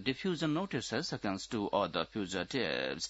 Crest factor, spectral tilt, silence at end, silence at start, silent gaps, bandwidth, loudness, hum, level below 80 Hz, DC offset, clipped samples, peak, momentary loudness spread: 18 dB; -3.5 dB/octave; 0 s; 0 s; none; 8 kHz; -35 LUFS; none; -64 dBFS; under 0.1%; under 0.1%; -16 dBFS; 4 LU